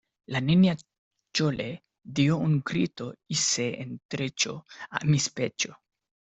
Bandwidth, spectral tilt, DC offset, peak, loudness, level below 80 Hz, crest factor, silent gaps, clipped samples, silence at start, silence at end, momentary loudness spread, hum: 8.4 kHz; -4.5 dB/octave; under 0.1%; -10 dBFS; -27 LUFS; -62 dBFS; 18 dB; 0.98-1.11 s, 4.05-4.09 s; under 0.1%; 0.3 s; 0.6 s; 13 LU; none